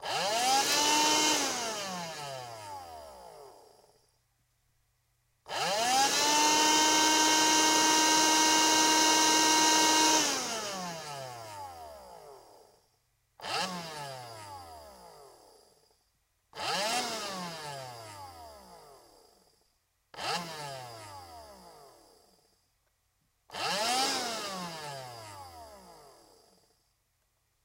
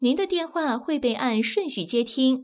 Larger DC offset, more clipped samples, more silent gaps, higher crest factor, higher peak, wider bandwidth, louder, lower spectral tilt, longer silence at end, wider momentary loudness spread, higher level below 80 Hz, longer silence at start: neither; neither; neither; first, 20 dB vs 14 dB; about the same, -12 dBFS vs -10 dBFS; first, 16 kHz vs 4 kHz; about the same, -26 LUFS vs -25 LUFS; second, -0.5 dB/octave vs -9 dB/octave; first, 1.7 s vs 0 s; first, 23 LU vs 4 LU; second, -70 dBFS vs -64 dBFS; about the same, 0 s vs 0 s